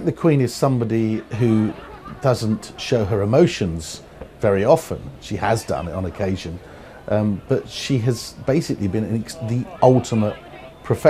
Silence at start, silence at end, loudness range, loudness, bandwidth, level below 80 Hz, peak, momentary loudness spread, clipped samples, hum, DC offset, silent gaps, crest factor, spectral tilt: 0 s; 0 s; 3 LU; -21 LUFS; 15.5 kHz; -46 dBFS; 0 dBFS; 17 LU; under 0.1%; none; under 0.1%; none; 20 dB; -6.5 dB/octave